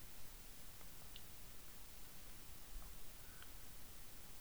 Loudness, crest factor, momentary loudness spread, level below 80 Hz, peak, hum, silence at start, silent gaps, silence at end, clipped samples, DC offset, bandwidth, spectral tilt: -55 LUFS; 18 dB; 1 LU; -60 dBFS; -36 dBFS; none; 0 s; none; 0 s; under 0.1%; 0.2%; over 20 kHz; -2.5 dB/octave